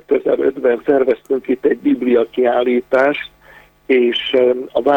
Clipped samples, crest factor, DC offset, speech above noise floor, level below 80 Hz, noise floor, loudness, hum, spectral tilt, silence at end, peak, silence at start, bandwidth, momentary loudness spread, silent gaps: under 0.1%; 14 dB; under 0.1%; 31 dB; -54 dBFS; -46 dBFS; -16 LUFS; none; -6 dB/octave; 0 s; -2 dBFS; 0.1 s; 17 kHz; 3 LU; none